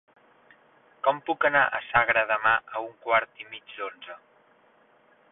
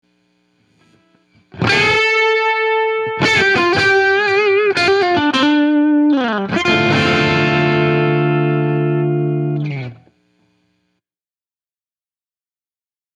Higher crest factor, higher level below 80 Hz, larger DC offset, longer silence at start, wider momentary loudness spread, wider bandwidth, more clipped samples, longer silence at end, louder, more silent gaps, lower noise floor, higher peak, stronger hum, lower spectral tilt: first, 20 dB vs 14 dB; second, -64 dBFS vs -50 dBFS; neither; second, 1.05 s vs 1.55 s; first, 18 LU vs 6 LU; second, 4 kHz vs 10 kHz; neither; second, 1.15 s vs 3.25 s; second, -25 LUFS vs -14 LUFS; neither; second, -61 dBFS vs under -90 dBFS; second, -8 dBFS vs -2 dBFS; neither; first, -7.5 dB/octave vs -5.5 dB/octave